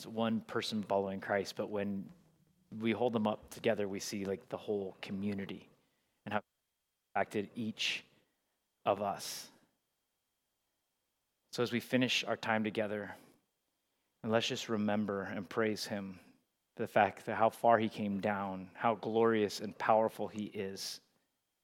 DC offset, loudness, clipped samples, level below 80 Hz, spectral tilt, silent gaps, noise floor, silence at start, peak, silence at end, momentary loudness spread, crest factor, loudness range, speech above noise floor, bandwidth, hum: under 0.1%; -35 LUFS; under 0.1%; -82 dBFS; -4.5 dB/octave; none; -85 dBFS; 0 s; -12 dBFS; 0.65 s; 12 LU; 24 dB; 8 LU; 50 dB; 17 kHz; none